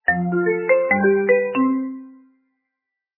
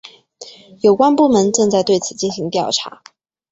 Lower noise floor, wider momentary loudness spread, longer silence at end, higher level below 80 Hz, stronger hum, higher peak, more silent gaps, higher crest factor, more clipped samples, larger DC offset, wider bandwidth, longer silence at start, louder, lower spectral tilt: first, -82 dBFS vs -40 dBFS; about the same, 10 LU vs 9 LU; first, 1.05 s vs 0.6 s; about the same, -60 dBFS vs -58 dBFS; neither; about the same, -4 dBFS vs -2 dBFS; neither; about the same, 16 dB vs 16 dB; neither; neither; second, 3.1 kHz vs 8.2 kHz; about the same, 0.1 s vs 0.05 s; second, -18 LUFS vs -15 LUFS; first, -11.5 dB/octave vs -4.5 dB/octave